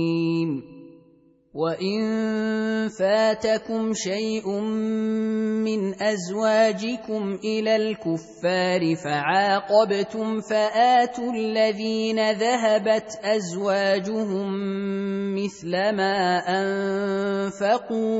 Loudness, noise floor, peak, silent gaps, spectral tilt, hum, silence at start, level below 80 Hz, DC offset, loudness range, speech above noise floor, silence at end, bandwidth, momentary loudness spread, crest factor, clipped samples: -23 LUFS; -57 dBFS; -6 dBFS; none; -5 dB/octave; none; 0 s; -66 dBFS; under 0.1%; 3 LU; 34 dB; 0 s; 8 kHz; 7 LU; 16 dB; under 0.1%